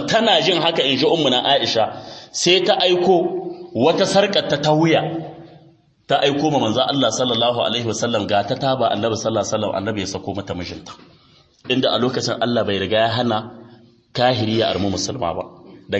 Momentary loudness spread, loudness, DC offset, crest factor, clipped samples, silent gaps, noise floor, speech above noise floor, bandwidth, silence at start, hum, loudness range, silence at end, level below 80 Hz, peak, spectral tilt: 13 LU; -18 LUFS; under 0.1%; 18 dB; under 0.1%; none; -53 dBFS; 35 dB; 8.8 kHz; 0 s; none; 6 LU; 0 s; -56 dBFS; -2 dBFS; -4 dB/octave